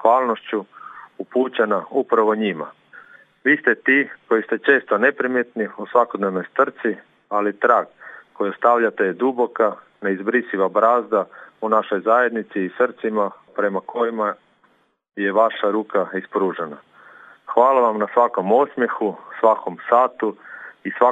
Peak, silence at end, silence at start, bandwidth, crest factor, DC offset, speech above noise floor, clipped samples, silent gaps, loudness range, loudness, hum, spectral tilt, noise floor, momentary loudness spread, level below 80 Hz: 0 dBFS; 0 s; 0 s; 7.8 kHz; 20 dB; under 0.1%; 41 dB; under 0.1%; none; 4 LU; -20 LUFS; none; -7.5 dB/octave; -61 dBFS; 12 LU; -82 dBFS